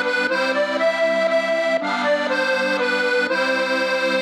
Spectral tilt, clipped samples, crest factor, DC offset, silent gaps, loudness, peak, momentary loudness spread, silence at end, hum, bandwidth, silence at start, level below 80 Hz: -3 dB/octave; under 0.1%; 12 dB; under 0.1%; none; -19 LUFS; -8 dBFS; 1 LU; 0 s; none; 13 kHz; 0 s; -82 dBFS